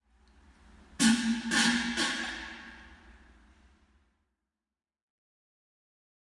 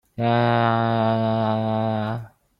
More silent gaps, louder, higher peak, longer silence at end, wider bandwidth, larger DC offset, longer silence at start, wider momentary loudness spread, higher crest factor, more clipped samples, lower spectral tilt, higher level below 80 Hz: neither; second, -28 LUFS vs -22 LUFS; second, -12 dBFS vs -6 dBFS; first, 3.2 s vs 0.3 s; first, 11.5 kHz vs 5.4 kHz; neither; first, 0.95 s vs 0.2 s; first, 18 LU vs 7 LU; first, 22 dB vs 16 dB; neither; second, -2 dB/octave vs -9 dB/octave; about the same, -60 dBFS vs -56 dBFS